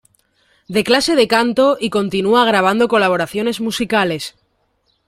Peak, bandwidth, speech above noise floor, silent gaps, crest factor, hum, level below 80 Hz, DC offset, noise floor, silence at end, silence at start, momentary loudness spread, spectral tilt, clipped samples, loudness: -2 dBFS; 16 kHz; 49 dB; none; 14 dB; none; -52 dBFS; under 0.1%; -64 dBFS; 0.8 s; 0.7 s; 7 LU; -4 dB/octave; under 0.1%; -15 LUFS